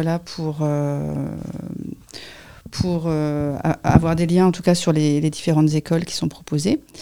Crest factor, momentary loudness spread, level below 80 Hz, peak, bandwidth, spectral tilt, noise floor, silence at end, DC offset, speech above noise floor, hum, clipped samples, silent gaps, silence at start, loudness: 20 dB; 16 LU; -42 dBFS; 0 dBFS; 15 kHz; -6.5 dB/octave; -40 dBFS; 0 s; 0.3%; 21 dB; none; under 0.1%; none; 0 s; -20 LUFS